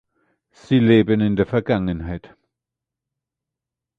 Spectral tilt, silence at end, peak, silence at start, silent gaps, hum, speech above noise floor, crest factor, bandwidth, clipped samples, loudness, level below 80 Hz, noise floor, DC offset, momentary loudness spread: -9 dB/octave; 1.8 s; -2 dBFS; 0.7 s; none; none; 68 dB; 20 dB; 7.2 kHz; under 0.1%; -18 LUFS; -44 dBFS; -86 dBFS; under 0.1%; 15 LU